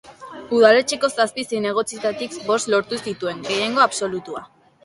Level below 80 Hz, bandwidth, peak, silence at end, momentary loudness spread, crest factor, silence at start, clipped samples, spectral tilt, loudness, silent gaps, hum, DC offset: -64 dBFS; 11.5 kHz; 0 dBFS; 0.4 s; 15 LU; 20 dB; 0.05 s; under 0.1%; -3 dB/octave; -20 LUFS; none; none; under 0.1%